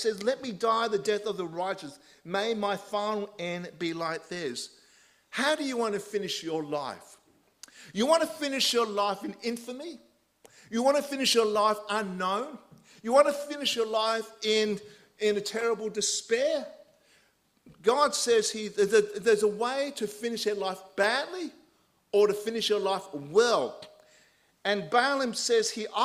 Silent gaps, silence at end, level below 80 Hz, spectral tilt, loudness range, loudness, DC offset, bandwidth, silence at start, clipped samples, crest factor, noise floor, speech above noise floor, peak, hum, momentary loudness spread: none; 0 s; -74 dBFS; -2.5 dB/octave; 5 LU; -28 LUFS; under 0.1%; 15.5 kHz; 0 s; under 0.1%; 22 dB; -67 dBFS; 39 dB; -8 dBFS; none; 11 LU